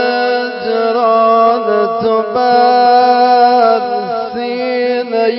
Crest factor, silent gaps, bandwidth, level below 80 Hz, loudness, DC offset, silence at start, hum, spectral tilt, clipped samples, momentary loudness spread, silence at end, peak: 12 dB; none; 5.8 kHz; -58 dBFS; -12 LUFS; under 0.1%; 0 s; none; -8 dB/octave; under 0.1%; 9 LU; 0 s; 0 dBFS